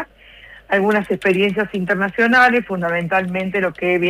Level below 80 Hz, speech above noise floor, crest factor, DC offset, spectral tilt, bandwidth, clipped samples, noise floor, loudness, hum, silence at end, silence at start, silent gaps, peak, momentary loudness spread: -52 dBFS; 26 dB; 14 dB; under 0.1%; -6.5 dB/octave; 15.5 kHz; under 0.1%; -43 dBFS; -17 LUFS; none; 0 s; 0 s; none; -4 dBFS; 8 LU